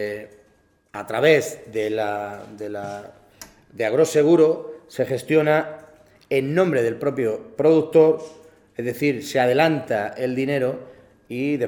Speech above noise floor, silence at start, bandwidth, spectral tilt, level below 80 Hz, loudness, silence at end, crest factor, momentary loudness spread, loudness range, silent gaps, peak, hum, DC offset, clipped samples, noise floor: 40 dB; 0 s; 19.5 kHz; -6 dB/octave; -64 dBFS; -21 LUFS; 0 s; 20 dB; 18 LU; 4 LU; none; -2 dBFS; none; under 0.1%; under 0.1%; -60 dBFS